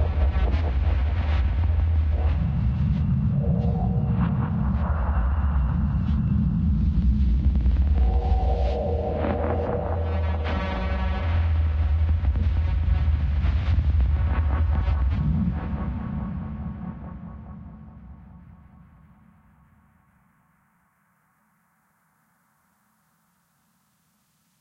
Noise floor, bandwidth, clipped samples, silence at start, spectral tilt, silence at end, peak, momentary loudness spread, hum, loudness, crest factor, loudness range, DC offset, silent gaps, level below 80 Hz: -67 dBFS; 5 kHz; under 0.1%; 0 s; -10 dB/octave; 6.15 s; -10 dBFS; 8 LU; none; -24 LUFS; 12 dB; 9 LU; under 0.1%; none; -26 dBFS